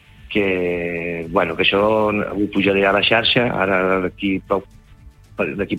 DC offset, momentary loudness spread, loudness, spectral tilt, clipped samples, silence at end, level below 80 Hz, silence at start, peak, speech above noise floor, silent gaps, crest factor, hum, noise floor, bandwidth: under 0.1%; 9 LU; -18 LUFS; -6.5 dB/octave; under 0.1%; 0 s; -46 dBFS; 0.25 s; -2 dBFS; 26 dB; none; 18 dB; none; -45 dBFS; 15.5 kHz